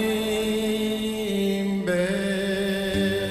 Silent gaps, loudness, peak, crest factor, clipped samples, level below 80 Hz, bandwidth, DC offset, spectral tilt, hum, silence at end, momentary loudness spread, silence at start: none; -25 LUFS; -12 dBFS; 12 dB; under 0.1%; -48 dBFS; 14.5 kHz; under 0.1%; -5 dB/octave; none; 0 s; 2 LU; 0 s